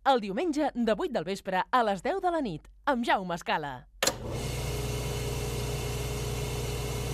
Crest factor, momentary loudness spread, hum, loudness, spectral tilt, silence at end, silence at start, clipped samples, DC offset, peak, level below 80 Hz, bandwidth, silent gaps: 18 dB; 6 LU; none; -31 LUFS; -4.5 dB/octave; 0 s; 0.05 s; under 0.1%; under 0.1%; -12 dBFS; -42 dBFS; 15.5 kHz; none